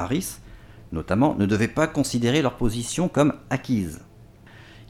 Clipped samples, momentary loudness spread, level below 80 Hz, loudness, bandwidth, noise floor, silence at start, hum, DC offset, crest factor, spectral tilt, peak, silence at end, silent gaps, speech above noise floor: under 0.1%; 13 LU; -42 dBFS; -24 LUFS; 16.5 kHz; -48 dBFS; 0 s; none; under 0.1%; 18 dB; -5.5 dB/octave; -6 dBFS; 0.05 s; none; 25 dB